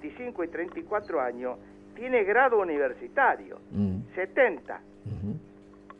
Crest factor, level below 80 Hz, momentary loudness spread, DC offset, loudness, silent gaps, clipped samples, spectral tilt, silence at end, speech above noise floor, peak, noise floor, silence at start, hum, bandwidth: 20 dB; -60 dBFS; 17 LU; under 0.1%; -28 LUFS; none; under 0.1%; -8.5 dB/octave; 0.1 s; 22 dB; -10 dBFS; -50 dBFS; 0 s; 50 Hz at -50 dBFS; 5.4 kHz